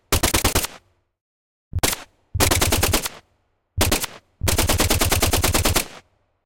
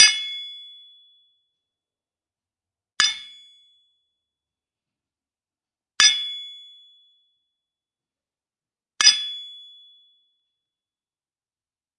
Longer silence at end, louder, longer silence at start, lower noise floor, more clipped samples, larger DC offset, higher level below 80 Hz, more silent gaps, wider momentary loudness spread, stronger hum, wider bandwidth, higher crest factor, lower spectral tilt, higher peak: second, 0.45 s vs 2.4 s; about the same, -20 LUFS vs -18 LUFS; about the same, 0.1 s vs 0 s; second, -67 dBFS vs under -90 dBFS; neither; first, 0.4% vs under 0.1%; first, -30 dBFS vs -78 dBFS; first, 1.21-1.71 s vs none; second, 13 LU vs 27 LU; neither; first, 17.5 kHz vs 12 kHz; second, 18 dB vs 26 dB; first, -3 dB/octave vs 4.5 dB/octave; about the same, -4 dBFS vs -2 dBFS